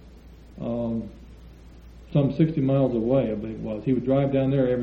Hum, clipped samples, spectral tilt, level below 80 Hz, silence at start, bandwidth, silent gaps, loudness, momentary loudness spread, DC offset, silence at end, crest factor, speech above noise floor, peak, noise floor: none; under 0.1%; -10.5 dB/octave; -46 dBFS; 0.05 s; 5.2 kHz; none; -24 LUFS; 10 LU; under 0.1%; 0 s; 16 dB; 23 dB; -8 dBFS; -46 dBFS